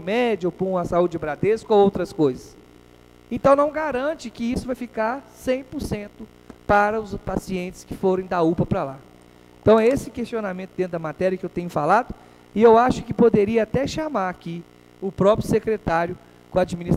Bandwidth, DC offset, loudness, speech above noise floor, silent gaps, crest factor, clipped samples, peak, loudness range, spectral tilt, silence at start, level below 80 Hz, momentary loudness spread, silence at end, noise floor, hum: 15 kHz; under 0.1%; -22 LUFS; 29 dB; none; 18 dB; under 0.1%; -4 dBFS; 5 LU; -7 dB/octave; 0 s; -46 dBFS; 14 LU; 0 s; -50 dBFS; 60 Hz at -50 dBFS